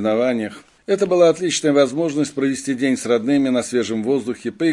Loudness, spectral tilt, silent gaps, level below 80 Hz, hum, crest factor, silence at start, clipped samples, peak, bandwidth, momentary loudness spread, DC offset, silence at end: -19 LUFS; -4.5 dB/octave; none; -62 dBFS; none; 16 dB; 0 s; under 0.1%; -4 dBFS; 11.5 kHz; 8 LU; under 0.1%; 0 s